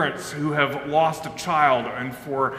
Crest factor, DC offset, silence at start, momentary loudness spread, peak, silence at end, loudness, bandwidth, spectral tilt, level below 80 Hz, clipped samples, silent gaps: 20 dB; under 0.1%; 0 s; 10 LU; -4 dBFS; 0 s; -23 LUFS; 16 kHz; -5 dB/octave; -58 dBFS; under 0.1%; none